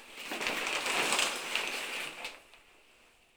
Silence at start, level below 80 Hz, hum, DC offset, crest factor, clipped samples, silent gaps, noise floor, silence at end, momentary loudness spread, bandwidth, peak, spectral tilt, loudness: 0 s; -70 dBFS; none; under 0.1%; 24 dB; under 0.1%; none; -63 dBFS; 0.75 s; 14 LU; over 20 kHz; -12 dBFS; 0 dB/octave; -32 LUFS